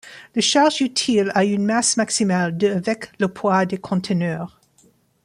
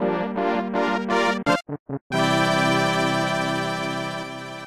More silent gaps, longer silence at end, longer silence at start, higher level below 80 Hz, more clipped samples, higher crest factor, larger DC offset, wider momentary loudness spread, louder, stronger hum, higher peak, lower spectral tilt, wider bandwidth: second, none vs 1.79-1.86 s, 2.01-2.10 s; first, 0.75 s vs 0 s; about the same, 0.05 s vs 0 s; about the same, -62 dBFS vs -62 dBFS; neither; about the same, 16 dB vs 16 dB; second, under 0.1% vs 0.2%; about the same, 9 LU vs 10 LU; first, -19 LUFS vs -23 LUFS; neither; first, -4 dBFS vs -8 dBFS; about the same, -4 dB/octave vs -5 dB/octave; second, 11.5 kHz vs 15.5 kHz